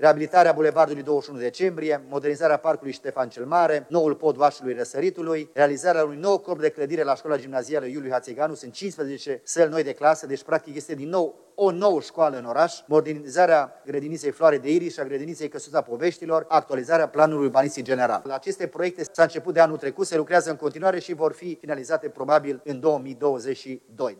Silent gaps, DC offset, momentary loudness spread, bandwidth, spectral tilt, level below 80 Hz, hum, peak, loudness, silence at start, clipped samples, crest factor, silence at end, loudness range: none; under 0.1%; 10 LU; 12 kHz; -5 dB/octave; -78 dBFS; none; -4 dBFS; -24 LUFS; 0 s; under 0.1%; 18 dB; 0.05 s; 3 LU